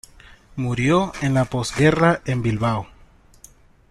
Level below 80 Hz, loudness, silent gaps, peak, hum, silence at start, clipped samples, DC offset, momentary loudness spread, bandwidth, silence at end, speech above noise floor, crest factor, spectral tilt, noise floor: -44 dBFS; -20 LUFS; none; -2 dBFS; none; 0.55 s; under 0.1%; under 0.1%; 12 LU; 12.5 kHz; 1.05 s; 31 dB; 18 dB; -6 dB/octave; -50 dBFS